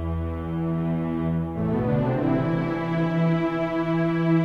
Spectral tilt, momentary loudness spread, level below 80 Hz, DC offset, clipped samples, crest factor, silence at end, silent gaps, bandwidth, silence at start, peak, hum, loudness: -9.5 dB/octave; 4 LU; -42 dBFS; under 0.1%; under 0.1%; 14 dB; 0 s; none; 5.2 kHz; 0 s; -10 dBFS; none; -25 LUFS